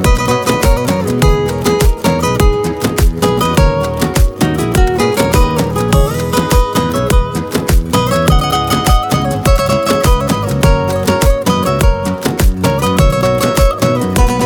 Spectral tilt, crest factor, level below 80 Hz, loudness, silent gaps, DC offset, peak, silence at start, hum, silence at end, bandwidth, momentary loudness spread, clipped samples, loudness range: -5.5 dB/octave; 12 dB; -16 dBFS; -13 LUFS; none; under 0.1%; 0 dBFS; 0 s; none; 0 s; 19 kHz; 3 LU; under 0.1%; 1 LU